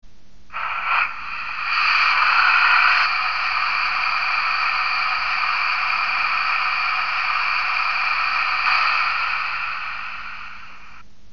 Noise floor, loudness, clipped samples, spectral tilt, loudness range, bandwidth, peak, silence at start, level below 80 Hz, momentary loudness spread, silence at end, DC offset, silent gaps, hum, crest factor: -49 dBFS; -19 LUFS; under 0.1%; -0.5 dB/octave; 3 LU; 7 kHz; -4 dBFS; 0 s; -54 dBFS; 13 LU; 0.3 s; 2%; none; none; 16 dB